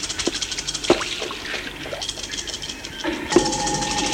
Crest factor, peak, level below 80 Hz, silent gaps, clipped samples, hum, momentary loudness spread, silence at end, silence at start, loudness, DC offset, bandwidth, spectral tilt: 22 dB; -2 dBFS; -44 dBFS; none; under 0.1%; none; 9 LU; 0 s; 0 s; -24 LUFS; under 0.1%; 16.5 kHz; -2.5 dB/octave